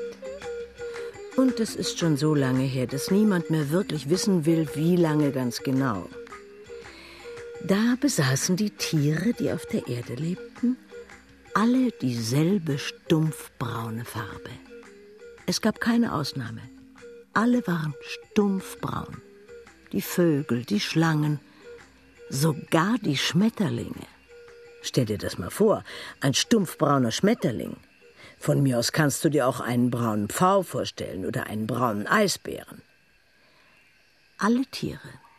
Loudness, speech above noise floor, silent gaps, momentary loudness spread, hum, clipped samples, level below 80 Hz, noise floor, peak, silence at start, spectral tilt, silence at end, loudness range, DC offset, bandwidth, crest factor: -25 LUFS; 37 dB; none; 15 LU; none; under 0.1%; -60 dBFS; -62 dBFS; -6 dBFS; 0 s; -5.5 dB/octave; 0.2 s; 4 LU; under 0.1%; 14 kHz; 20 dB